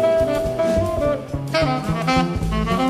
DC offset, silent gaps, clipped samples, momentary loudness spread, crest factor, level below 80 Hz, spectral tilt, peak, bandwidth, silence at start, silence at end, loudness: under 0.1%; none; under 0.1%; 4 LU; 14 dB; -32 dBFS; -6.5 dB/octave; -6 dBFS; 15.5 kHz; 0 s; 0 s; -20 LUFS